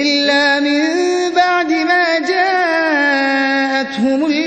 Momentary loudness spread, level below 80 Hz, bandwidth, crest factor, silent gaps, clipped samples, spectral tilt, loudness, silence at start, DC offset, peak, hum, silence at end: 3 LU; -62 dBFS; 8.8 kHz; 12 dB; none; under 0.1%; -3 dB/octave; -14 LUFS; 0 s; under 0.1%; -2 dBFS; none; 0 s